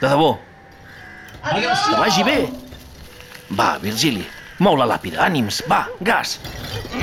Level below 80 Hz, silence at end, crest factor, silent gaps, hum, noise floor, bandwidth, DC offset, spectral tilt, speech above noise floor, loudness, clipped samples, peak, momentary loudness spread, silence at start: -46 dBFS; 0 s; 14 dB; none; none; -42 dBFS; 17 kHz; under 0.1%; -4 dB/octave; 24 dB; -19 LUFS; under 0.1%; -6 dBFS; 22 LU; 0 s